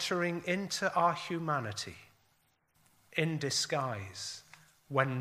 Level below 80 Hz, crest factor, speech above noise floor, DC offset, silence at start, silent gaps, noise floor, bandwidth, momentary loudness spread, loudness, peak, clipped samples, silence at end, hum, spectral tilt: -76 dBFS; 24 dB; 40 dB; under 0.1%; 0 s; none; -73 dBFS; 15.5 kHz; 11 LU; -34 LUFS; -12 dBFS; under 0.1%; 0 s; none; -4 dB/octave